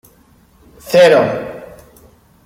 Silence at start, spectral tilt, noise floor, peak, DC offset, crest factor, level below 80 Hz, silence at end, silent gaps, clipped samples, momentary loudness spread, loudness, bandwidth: 0.85 s; -4.5 dB/octave; -49 dBFS; -2 dBFS; under 0.1%; 16 dB; -52 dBFS; 0.8 s; none; under 0.1%; 21 LU; -12 LUFS; 16 kHz